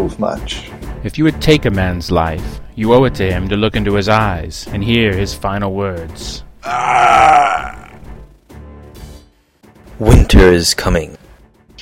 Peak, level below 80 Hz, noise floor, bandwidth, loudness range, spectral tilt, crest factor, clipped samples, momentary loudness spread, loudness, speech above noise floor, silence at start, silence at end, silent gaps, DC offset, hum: 0 dBFS; -22 dBFS; -48 dBFS; 16.5 kHz; 3 LU; -5.5 dB/octave; 14 dB; 0.1%; 18 LU; -13 LUFS; 35 dB; 0 s; 0 s; none; under 0.1%; none